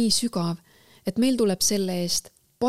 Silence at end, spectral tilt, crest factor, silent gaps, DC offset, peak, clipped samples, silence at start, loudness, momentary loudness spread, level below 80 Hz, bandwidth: 0 s; -4 dB/octave; 16 dB; none; under 0.1%; -10 dBFS; under 0.1%; 0 s; -24 LUFS; 9 LU; -56 dBFS; 16 kHz